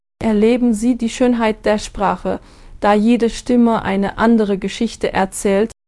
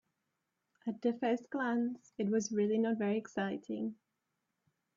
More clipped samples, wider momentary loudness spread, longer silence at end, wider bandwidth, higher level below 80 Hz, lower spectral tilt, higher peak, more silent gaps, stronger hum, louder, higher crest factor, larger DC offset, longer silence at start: neither; about the same, 6 LU vs 8 LU; second, 0.15 s vs 1 s; first, 12 kHz vs 7.6 kHz; first, -38 dBFS vs -82 dBFS; about the same, -5.5 dB/octave vs -5.5 dB/octave; first, 0 dBFS vs -22 dBFS; neither; neither; first, -16 LUFS vs -36 LUFS; about the same, 16 dB vs 16 dB; neither; second, 0.2 s vs 0.85 s